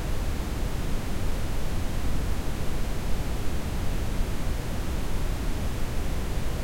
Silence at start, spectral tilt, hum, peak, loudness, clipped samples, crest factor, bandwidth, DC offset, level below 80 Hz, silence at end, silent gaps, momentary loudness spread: 0 s; -5.5 dB/octave; none; -12 dBFS; -32 LUFS; under 0.1%; 12 dB; 16.5 kHz; under 0.1%; -30 dBFS; 0 s; none; 1 LU